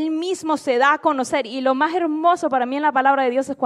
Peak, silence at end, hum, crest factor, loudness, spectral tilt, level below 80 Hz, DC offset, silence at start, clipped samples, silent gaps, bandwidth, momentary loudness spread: -4 dBFS; 0 s; none; 14 dB; -19 LUFS; -3 dB/octave; -70 dBFS; under 0.1%; 0 s; under 0.1%; none; 12.5 kHz; 6 LU